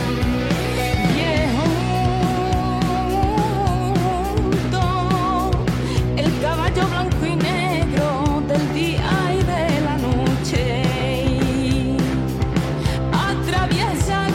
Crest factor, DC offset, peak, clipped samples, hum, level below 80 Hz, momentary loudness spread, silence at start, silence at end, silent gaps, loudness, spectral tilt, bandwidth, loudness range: 12 dB; under 0.1%; -6 dBFS; under 0.1%; none; -28 dBFS; 2 LU; 0 s; 0 s; none; -20 LUFS; -6 dB/octave; 16.5 kHz; 1 LU